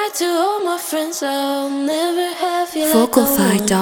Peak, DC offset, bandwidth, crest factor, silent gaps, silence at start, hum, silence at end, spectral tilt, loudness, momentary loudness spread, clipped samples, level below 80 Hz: 0 dBFS; under 0.1%; over 20 kHz; 16 dB; none; 0 s; none; 0 s; -4 dB/octave; -17 LUFS; 7 LU; under 0.1%; -52 dBFS